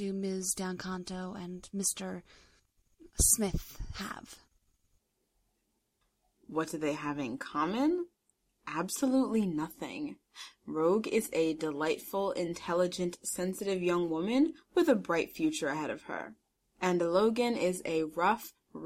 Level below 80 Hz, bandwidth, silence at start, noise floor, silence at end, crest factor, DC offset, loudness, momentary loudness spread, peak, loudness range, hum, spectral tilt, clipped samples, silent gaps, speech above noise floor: -52 dBFS; 16 kHz; 0 s; -79 dBFS; 0 s; 22 dB; under 0.1%; -32 LUFS; 14 LU; -12 dBFS; 6 LU; none; -4 dB/octave; under 0.1%; none; 47 dB